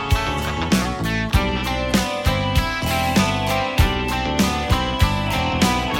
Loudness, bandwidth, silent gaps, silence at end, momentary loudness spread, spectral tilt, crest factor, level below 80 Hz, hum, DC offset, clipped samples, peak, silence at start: -20 LUFS; 17 kHz; none; 0 s; 3 LU; -5 dB/octave; 16 dB; -26 dBFS; none; under 0.1%; under 0.1%; -4 dBFS; 0 s